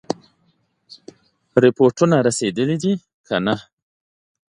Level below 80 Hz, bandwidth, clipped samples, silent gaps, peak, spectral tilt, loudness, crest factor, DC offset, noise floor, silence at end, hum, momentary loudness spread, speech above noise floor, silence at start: -60 dBFS; 11 kHz; under 0.1%; 3.14-3.24 s; 0 dBFS; -5.5 dB/octave; -19 LUFS; 20 dB; under 0.1%; -64 dBFS; 0.9 s; none; 12 LU; 47 dB; 0.1 s